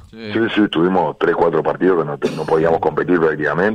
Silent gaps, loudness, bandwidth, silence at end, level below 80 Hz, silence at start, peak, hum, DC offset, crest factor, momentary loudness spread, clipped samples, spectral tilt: none; -17 LUFS; 10 kHz; 0 s; -48 dBFS; 0.05 s; -4 dBFS; none; under 0.1%; 14 dB; 4 LU; under 0.1%; -7 dB/octave